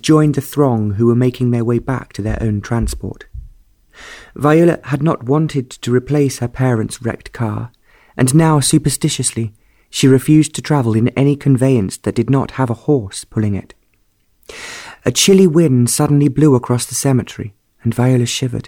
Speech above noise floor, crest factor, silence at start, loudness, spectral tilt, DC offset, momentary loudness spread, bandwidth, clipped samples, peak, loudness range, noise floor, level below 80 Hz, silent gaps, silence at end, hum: 45 dB; 14 dB; 0.05 s; -15 LUFS; -5.5 dB/octave; under 0.1%; 15 LU; 19 kHz; under 0.1%; -2 dBFS; 5 LU; -59 dBFS; -38 dBFS; none; 0.05 s; none